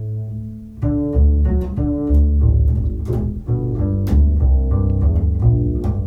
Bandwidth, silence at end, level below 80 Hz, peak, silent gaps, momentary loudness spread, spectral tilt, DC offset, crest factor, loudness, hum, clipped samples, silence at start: 2 kHz; 0 s; -18 dBFS; -4 dBFS; none; 8 LU; -11.5 dB/octave; under 0.1%; 12 dB; -18 LUFS; none; under 0.1%; 0 s